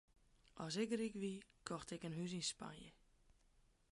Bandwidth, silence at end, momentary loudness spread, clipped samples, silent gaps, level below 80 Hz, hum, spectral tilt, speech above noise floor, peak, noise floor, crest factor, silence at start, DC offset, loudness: 11.5 kHz; 1 s; 15 LU; under 0.1%; none; -74 dBFS; none; -4.5 dB/octave; 29 dB; -28 dBFS; -74 dBFS; 20 dB; 0.55 s; under 0.1%; -46 LUFS